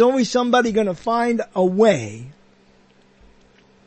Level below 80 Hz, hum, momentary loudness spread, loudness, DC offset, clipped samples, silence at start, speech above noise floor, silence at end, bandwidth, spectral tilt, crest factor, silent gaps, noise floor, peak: -56 dBFS; none; 8 LU; -18 LUFS; under 0.1%; under 0.1%; 0 s; 36 dB; 1.55 s; 8.8 kHz; -5.5 dB/octave; 18 dB; none; -54 dBFS; -4 dBFS